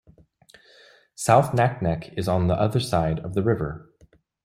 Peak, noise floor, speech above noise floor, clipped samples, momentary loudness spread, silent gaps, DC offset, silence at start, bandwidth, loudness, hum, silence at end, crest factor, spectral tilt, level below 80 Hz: -2 dBFS; -58 dBFS; 36 dB; under 0.1%; 9 LU; none; under 0.1%; 1.2 s; 15 kHz; -23 LUFS; none; 0.65 s; 22 dB; -6.5 dB/octave; -48 dBFS